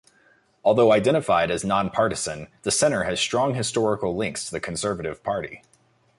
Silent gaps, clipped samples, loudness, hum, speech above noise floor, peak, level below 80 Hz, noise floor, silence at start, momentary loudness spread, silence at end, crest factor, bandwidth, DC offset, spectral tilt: none; under 0.1%; -23 LUFS; none; 38 dB; -8 dBFS; -52 dBFS; -60 dBFS; 0.65 s; 11 LU; 0.6 s; 16 dB; 11.5 kHz; under 0.1%; -4 dB/octave